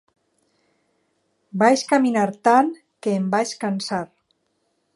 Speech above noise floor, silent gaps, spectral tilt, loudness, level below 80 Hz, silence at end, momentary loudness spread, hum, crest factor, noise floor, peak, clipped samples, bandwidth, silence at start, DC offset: 51 dB; none; -5 dB/octave; -20 LUFS; -72 dBFS; 0.9 s; 12 LU; none; 20 dB; -70 dBFS; -2 dBFS; under 0.1%; 11.5 kHz; 1.55 s; under 0.1%